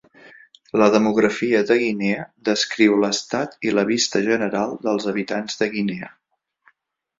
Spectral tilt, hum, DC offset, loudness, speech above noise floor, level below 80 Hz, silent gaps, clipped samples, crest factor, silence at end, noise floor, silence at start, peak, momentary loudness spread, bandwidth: -4 dB/octave; none; under 0.1%; -20 LUFS; 48 dB; -62 dBFS; none; under 0.1%; 18 dB; 1.1 s; -68 dBFS; 0.75 s; -2 dBFS; 9 LU; 7.8 kHz